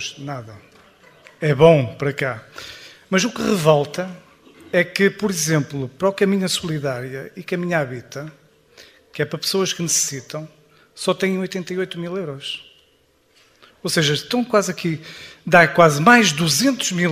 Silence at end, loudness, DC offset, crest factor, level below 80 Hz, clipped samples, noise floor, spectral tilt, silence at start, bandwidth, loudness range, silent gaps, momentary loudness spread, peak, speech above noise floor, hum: 0 s; -19 LUFS; under 0.1%; 20 dB; -56 dBFS; under 0.1%; -59 dBFS; -4 dB/octave; 0 s; 15.5 kHz; 8 LU; none; 19 LU; 0 dBFS; 40 dB; none